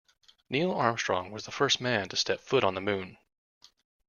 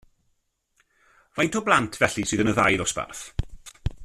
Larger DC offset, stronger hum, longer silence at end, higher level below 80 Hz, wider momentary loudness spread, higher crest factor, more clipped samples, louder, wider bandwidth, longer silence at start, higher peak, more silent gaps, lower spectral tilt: neither; neither; first, 0.95 s vs 0 s; second, -68 dBFS vs -42 dBFS; second, 7 LU vs 15 LU; about the same, 22 dB vs 24 dB; neither; second, -29 LUFS vs -24 LUFS; second, 7.4 kHz vs 14 kHz; second, 0.5 s vs 1.35 s; second, -8 dBFS vs -4 dBFS; neither; about the same, -3.5 dB/octave vs -4 dB/octave